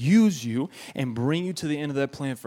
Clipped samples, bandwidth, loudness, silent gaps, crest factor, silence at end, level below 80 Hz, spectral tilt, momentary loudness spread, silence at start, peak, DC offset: under 0.1%; 15.5 kHz; -26 LUFS; none; 14 dB; 0.05 s; -66 dBFS; -6 dB/octave; 11 LU; 0 s; -10 dBFS; under 0.1%